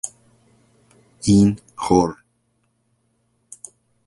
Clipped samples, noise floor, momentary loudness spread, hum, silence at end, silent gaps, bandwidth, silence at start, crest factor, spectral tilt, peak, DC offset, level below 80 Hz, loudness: under 0.1%; -67 dBFS; 24 LU; none; 1.95 s; none; 11.5 kHz; 0.05 s; 22 dB; -6.5 dB/octave; 0 dBFS; under 0.1%; -46 dBFS; -19 LUFS